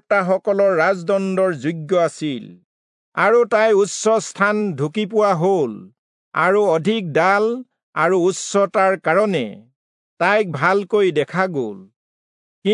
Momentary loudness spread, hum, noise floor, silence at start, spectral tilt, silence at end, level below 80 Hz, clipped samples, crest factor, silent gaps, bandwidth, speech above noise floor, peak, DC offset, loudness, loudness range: 10 LU; none; under -90 dBFS; 0.1 s; -5 dB/octave; 0 s; -76 dBFS; under 0.1%; 16 dB; 2.64-3.12 s, 5.98-6.32 s, 7.83-7.93 s, 9.76-10.17 s, 11.96-12.62 s; 11 kHz; over 72 dB; -2 dBFS; under 0.1%; -18 LUFS; 2 LU